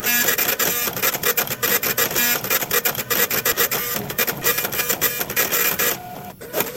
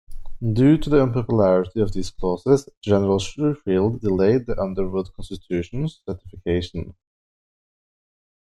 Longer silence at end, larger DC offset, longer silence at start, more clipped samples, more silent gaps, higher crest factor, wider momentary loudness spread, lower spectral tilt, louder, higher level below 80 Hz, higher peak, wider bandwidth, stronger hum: second, 0 s vs 1.6 s; neither; about the same, 0 s vs 0.1 s; neither; second, none vs 2.77-2.81 s; about the same, 20 dB vs 18 dB; second, 5 LU vs 13 LU; second, -1 dB/octave vs -7.5 dB/octave; first, -18 LUFS vs -21 LUFS; second, -52 dBFS vs -38 dBFS; about the same, -2 dBFS vs -4 dBFS; first, 17 kHz vs 11.5 kHz; neither